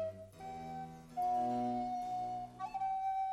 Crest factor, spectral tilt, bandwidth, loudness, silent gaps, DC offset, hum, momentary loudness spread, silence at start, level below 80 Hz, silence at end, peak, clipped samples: 12 dB; -6.5 dB/octave; 13 kHz; -39 LUFS; none; under 0.1%; none; 12 LU; 0 s; -66 dBFS; 0 s; -28 dBFS; under 0.1%